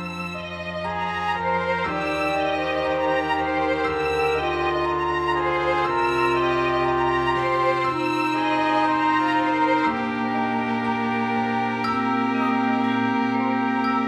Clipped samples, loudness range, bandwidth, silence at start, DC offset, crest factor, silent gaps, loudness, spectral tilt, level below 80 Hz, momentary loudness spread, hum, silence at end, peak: under 0.1%; 2 LU; 14 kHz; 0 s; under 0.1%; 12 dB; none; -22 LUFS; -6 dB/octave; -50 dBFS; 4 LU; none; 0 s; -10 dBFS